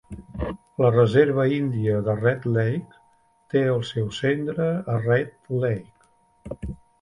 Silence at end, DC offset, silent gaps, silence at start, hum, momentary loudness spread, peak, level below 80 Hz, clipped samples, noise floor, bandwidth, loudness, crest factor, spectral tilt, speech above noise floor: 0.25 s; under 0.1%; none; 0.1 s; none; 14 LU; -4 dBFS; -46 dBFS; under 0.1%; -61 dBFS; 10.5 kHz; -23 LUFS; 20 dB; -8 dB/octave; 39 dB